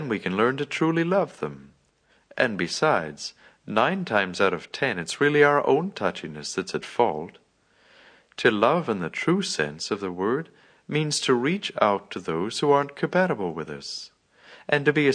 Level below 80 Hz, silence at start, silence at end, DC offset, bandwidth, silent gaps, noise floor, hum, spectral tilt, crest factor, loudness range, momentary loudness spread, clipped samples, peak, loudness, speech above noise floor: -66 dBFS; 0 s; 0 s; under 0.1%; 10.5 kHz; none; -64 dBFS; none; -4.5 dB/octave; 20 dB; 3 LU; 13 LU; under 0.1%; -4 dBFS; -24 LUFS; 40 dB